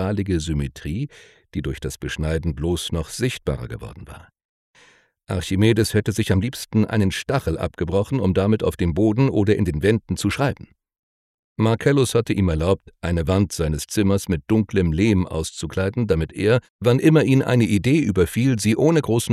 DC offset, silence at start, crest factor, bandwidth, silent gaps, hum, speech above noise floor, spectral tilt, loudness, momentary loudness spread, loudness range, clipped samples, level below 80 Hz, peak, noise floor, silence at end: under 0.1%; 0 s; 18 dB; 14.5 kHz; 4.45-4.74 s, 10.99-11.56 s, 16.70-16.79 s; none; 35 dB; -6.5 dB/octave; -21 LUFS; 11 LU; 7 LU; under 0.1%; -38 dBFS; -2 dBFS; -55 dBFS; 0 s